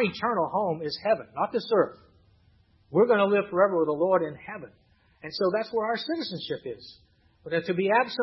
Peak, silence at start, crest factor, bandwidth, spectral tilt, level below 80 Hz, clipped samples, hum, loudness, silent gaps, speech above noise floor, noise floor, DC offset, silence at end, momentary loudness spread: -8 dBFS; 0 s; 20 dB; 6 kHz; -7.5 dB/octave; -68 dBFS; under 0.1%; none; -26 LUFS; none; 36 dB; -62 dBFS; under 0.1%; 0 s; 14 LU